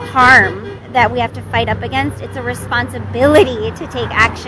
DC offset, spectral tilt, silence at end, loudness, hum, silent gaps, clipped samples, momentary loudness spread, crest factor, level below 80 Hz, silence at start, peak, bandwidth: under 0.1%; -5 dB/octave; 0 s; -14 LUFS; none; none; 0.3%; 15 LU; 14 dB; -36 dBFS; 0 s; 0 dBFS; 11 kHz